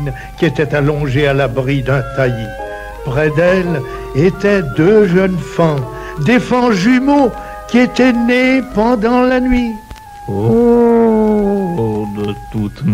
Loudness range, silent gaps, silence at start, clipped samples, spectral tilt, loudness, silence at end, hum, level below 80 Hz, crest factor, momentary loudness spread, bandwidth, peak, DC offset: 3 LU; none; 0 s; under 0.1%; -7 dB/octave; -13 LUFS; 0 s; none; -32 dBFS; 12 dB; 11 LU; 15 kHz; 0 dBFS; under 0.1%